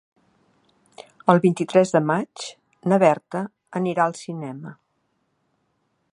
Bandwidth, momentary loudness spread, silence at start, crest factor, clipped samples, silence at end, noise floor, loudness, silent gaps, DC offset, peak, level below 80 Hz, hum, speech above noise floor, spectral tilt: 11 kHz; 17 LU; 1.25 s; 22 dB; under 0.1%; 1.4 s; -71 dBFS; -21 LUFS; none; under 0.1%; 0 dBFS; -72 dBFS; none; 50 dB; -6.5 dB/octave